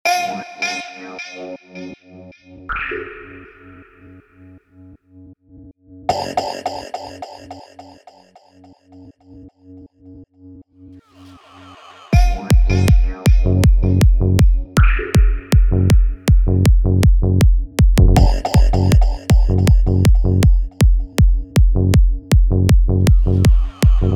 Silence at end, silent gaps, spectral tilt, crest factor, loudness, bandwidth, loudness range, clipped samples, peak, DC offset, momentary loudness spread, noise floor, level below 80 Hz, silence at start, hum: 0 s; none; -6.5 dB/octave; 14 dB; -16 LUFS; 13 kHz; 17 LU; under 0.1%; 0 dBFS; under 0.1%; 16 LU; -48 dBFS; -16 dBFS; 0.05 s; none